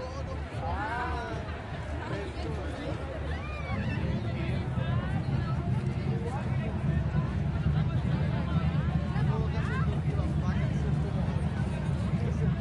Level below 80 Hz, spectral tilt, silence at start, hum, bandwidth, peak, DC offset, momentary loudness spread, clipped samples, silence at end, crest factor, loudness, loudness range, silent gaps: -40 dBFS; -8 dB/octave; 0 s; none; 11 kHz; -16 dBFS; under 0.1%; 6 LU; under 0.1%; 0 s; 14 dB; -31 LUFS; 5 LU; none